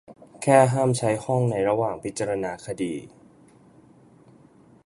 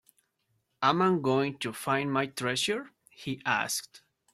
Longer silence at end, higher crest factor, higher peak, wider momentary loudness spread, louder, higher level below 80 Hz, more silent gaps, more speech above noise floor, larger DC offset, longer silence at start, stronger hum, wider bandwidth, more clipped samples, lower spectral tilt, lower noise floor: first, 1.8 s vs 0.35 s; about the same, 22 dB vs 20 dB; first, -4 dBFS vs -10 dBFS; first, 13 LU vs 9 LU; first, -23 LUFS vs -29 LUFS; first, -60 dBFS vs -72 dBFS; neither; second, 31 dB vs 47 dB; neither; second, 0.1 s vs 0.8 s; neither; second, 11.5 kHz vs 16 kHz; neither; first, -6 dB/octave vs -4 dB/octave; second, -54 dBFS vs -76 dBFS